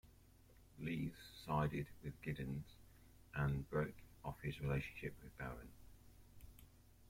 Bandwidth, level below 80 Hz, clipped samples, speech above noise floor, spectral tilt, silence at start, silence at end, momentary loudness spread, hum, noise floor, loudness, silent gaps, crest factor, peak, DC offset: 16.5 kHz; -60 dBFS; under 0.1%; 23 dB; -7.5 dB/octave; 0.05 s; 0 s; 25 LU; none; -66 dBFS; -46 LUFS; none; 20 dB; -26 dBFS; under 0.1%